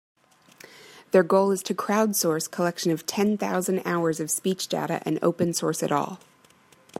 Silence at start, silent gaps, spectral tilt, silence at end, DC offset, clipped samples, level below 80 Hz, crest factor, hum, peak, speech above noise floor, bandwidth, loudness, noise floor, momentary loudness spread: 0.85 s; none; -4.5 dB/octave; 0.85 s; under 0.1%; under 0.1%; -72 dBFS; 20 dB; none; -6 dBFS; 33 dB; 16 kHz; -25 LUFS; -57 dBFS; 6 LU